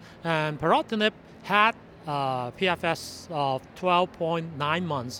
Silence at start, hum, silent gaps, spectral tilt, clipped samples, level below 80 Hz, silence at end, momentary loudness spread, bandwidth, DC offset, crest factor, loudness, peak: 0 s; none; none; -5 dB/octave; under 0.1%; -60 dBFS; 0 s; 8 LU; 18 kHz; under 0.1%; 22 dB; -26 LUFS; -6 dBFS